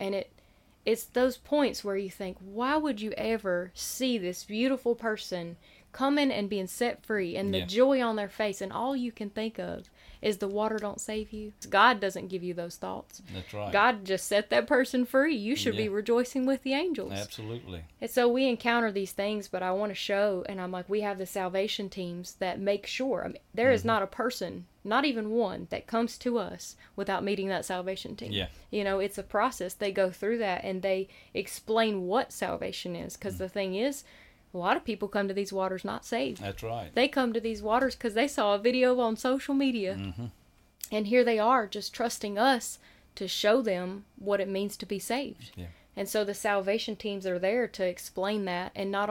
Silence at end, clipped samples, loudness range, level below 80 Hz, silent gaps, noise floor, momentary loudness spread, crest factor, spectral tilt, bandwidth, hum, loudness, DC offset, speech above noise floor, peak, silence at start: 0 s; under 0.1%; 4 LU; -60 dBFS; none; -61 dBFS; 12 LU; 20 dB; -4.5 dB/octave; 17 kHz; none; -30 LUFS; under 0.1%; 32 dB; -10 dBFS; 0 s